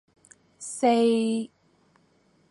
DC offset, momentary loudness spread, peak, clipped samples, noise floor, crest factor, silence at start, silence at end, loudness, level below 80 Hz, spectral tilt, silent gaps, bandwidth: under 0.1%; 19 LU; -10 dBFS; under 0.1%; -64 dBFS; 18 dB; 0.6 s; 1.05 s; -24 LUFS; -78 dBFS; -4.5 dB/octave; none; 11.5 kHz